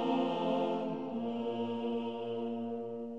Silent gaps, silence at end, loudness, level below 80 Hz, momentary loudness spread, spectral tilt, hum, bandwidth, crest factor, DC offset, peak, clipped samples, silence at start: none; 0 s; -36 LUFS; -80 dBFS; 6 LU; -7.5 dB/octave; none; 7.6 kHz; 14 dB; 0.1%; -20 dBFS; under 0.1%; 0 s